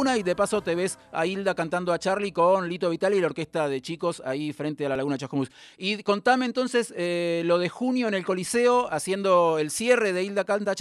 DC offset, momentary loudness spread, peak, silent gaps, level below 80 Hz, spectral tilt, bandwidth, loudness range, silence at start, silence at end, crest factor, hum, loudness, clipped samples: under 0.1%; 8 LU; -6 dBFS; none; -64 dBFS; -4.5 dB/octave; 13 kHz; 4 LU; 0 s; 0 s; 18 dB; none; -25 LUFS; under 0.1%